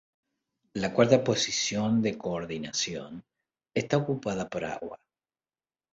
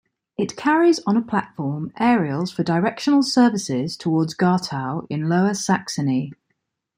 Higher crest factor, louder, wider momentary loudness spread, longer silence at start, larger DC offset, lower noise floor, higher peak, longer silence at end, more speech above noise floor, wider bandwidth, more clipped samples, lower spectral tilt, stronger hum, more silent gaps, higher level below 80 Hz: first, 24 dB vs 16 dB; second, -28 LUFS vs -21 LUFS; first, 17 LU vs 10 LU; first, 0.75 s vs 0.4 s; neither; first, under -90 dBFS vs -74 dBFS; about the same, -6 dBFS vs -4 dBFS; first, 1 s vs 0.65 s; first, over 62 dB vs 54 dB; second, 8 kHz vs 15.5 kHz; neither; about the same, -4.5 dB/octave vs -5.5 dB/octave; neither; neither; about the same, -62 dBFS vs -64 dBFS